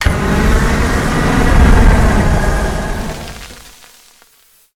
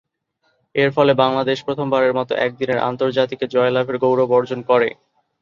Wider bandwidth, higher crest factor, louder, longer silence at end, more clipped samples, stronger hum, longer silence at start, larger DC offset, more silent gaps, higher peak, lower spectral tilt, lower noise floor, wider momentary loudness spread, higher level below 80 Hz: first, 15.5 kHz vs 7.2 kHz; about the same, 12 dB vs 16 dB; first, -13 LUFS vs -18 LUFS; first, 1.1 s vs 0.5 s; neither; neither; second, 0 s vs 0.75 s; neither; neither; about the same, 0 dBFS vs -2 dBFS; about the same, -6 dB/octave vs -7 dB/octave; second, -50 dBFS vs -67 dBFS; first, 16 LU vs 6 LU; first, -14 dBFS vs -62 dBFS